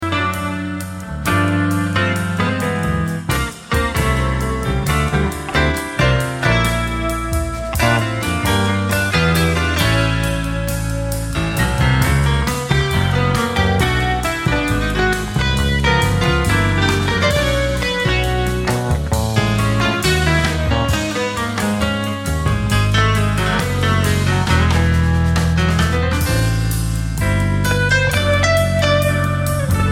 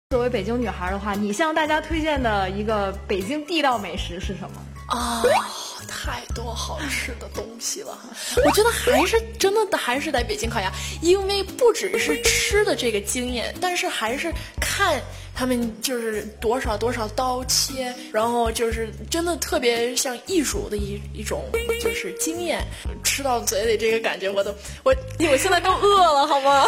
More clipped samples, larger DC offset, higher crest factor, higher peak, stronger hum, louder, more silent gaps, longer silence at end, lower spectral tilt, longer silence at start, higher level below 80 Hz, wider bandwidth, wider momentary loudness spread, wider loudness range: neither; neither; about the same, 16 dB vs 18 dB; first, 0 dBFS vs -4 dBFS; neither; first, -17 LUFS vs -22 LUFS; neither; about the same, 0 s vs 0 s; first, -5 dB/octave vs -3 dB/octave; about the same, 0 s vs 0.1 s; first, -24 dBFS vs -38 dBFS; about the same, 17 kHz vs 17 kHz; second, 5 LU vs 11 LU; about the same, 2 LU vs 4 LU